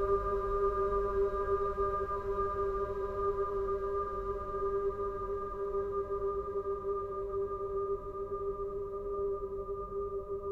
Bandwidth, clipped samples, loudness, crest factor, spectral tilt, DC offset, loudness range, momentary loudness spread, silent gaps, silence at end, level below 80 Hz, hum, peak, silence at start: 4.4 kHz; under 0.1%; -35 LUFS; 16 dB; -9 dB/octave; under 0.1%; 4 LU; 6 LU; none; 0 s; -46 dBFS; none; -20 dBFS; 0 s